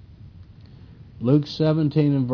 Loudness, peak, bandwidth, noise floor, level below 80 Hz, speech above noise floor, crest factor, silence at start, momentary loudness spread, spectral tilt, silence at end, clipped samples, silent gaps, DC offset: -21 LUFS; -6 dBFS; 5.4 kHz; -45 dBFS; -52 dBFS; 25 dB; 16 dB; 0.25 s; 2 LU; -9.5 dB/octave; 0 s; under 0.1%; none; under 0.1%